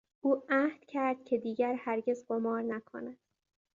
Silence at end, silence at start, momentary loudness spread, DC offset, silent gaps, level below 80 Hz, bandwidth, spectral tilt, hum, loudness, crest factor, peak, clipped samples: 0.65 s; 0.25 s; 11 LU; under 0.1%; none; -82 dBFS; 7.4 kHz; -6.5 dB/octave; none; -33 LUFS; 18 dB; -16 dBFS; under 0.1%